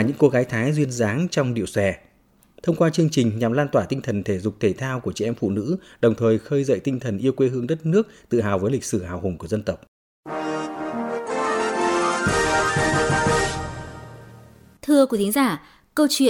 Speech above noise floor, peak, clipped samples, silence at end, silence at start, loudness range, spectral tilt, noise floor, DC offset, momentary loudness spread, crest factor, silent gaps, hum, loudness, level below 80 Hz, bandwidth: 37 dB; -4 dBFS; under 0.1%; 0 s; 0 s; 4 LU; -5.5 dB/octave; -58 dBFS; under 0.1%; 10 LU; 18 dB; 9.88-10.23 s; none; -22 LUFS; -48 dBFS; 19 kHz